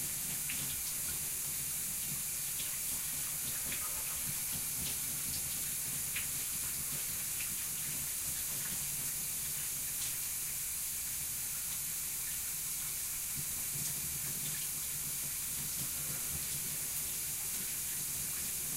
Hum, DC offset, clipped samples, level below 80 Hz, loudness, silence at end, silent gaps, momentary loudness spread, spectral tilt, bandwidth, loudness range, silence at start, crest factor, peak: none; under 0.1%; under 0.1%; -58 dBFS; -35 LUFS; 0 s; none; 1 LU; -0.5 dB/octave; 16 kHz; 1 LU; 0 s; 14 dB; -24 dBFS